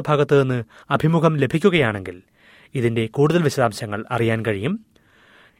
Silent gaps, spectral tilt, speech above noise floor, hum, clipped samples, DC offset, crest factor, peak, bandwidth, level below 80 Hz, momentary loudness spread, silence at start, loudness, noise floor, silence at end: none; -7 dB/octave; 34 dB; none; under 0.1%; under 0.1%; 18 dB; -2 dBFS; 15.5 kHz; -54 dBFS; 11 LU; 0 s; -20 LUFS; -53 dBFS; 0.8 s